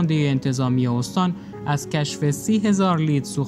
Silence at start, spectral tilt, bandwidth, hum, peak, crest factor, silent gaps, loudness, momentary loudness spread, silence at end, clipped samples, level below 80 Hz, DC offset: 0 s; -6 dB/octave; 15 kHz; none; -8 dBFS; 12 dB; none; -22 LUFS; 6 LU; 0 s; under 0.1%; -56 dBFS; under 0.1%